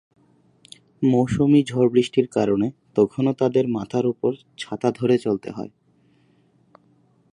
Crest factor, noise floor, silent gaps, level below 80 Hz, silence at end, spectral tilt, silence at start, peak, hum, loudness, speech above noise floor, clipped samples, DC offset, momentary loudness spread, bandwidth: 18 dB; -60 dBFS; none; -56 dBFS; 1.65 s; -7.5 dB/octave; 1 s; -4 dBFS; none; -21 LUFS; 39 dB; under 0.1%; under 0.1%; 10 LU; 11 kHz